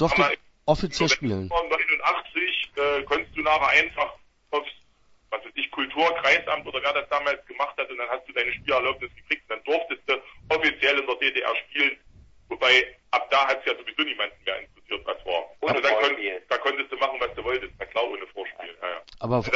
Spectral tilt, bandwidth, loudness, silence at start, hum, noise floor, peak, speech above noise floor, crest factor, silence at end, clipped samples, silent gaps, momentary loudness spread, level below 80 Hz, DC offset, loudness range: -3.5 dB/octave; 8 kHz; -24 LUFS; 0 s; none; -60 dBFS; -6 dBFS; 34 dB; 20 dB; 0 s; under 0.1%; none; 11 LU; -52 dBFS; under 0.1%; 4 LU